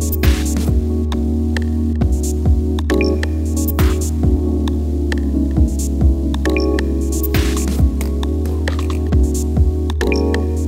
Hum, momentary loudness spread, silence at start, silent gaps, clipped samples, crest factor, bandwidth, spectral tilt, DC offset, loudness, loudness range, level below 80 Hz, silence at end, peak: none; 3 LU; 0 s; none; under 0.1%; 14 dB; 16.5 kHz; -6.5 dB/octave; under 0.1%; -17 LUFS; 1 LU; -18 dBFS; 0 s; -2 dBFS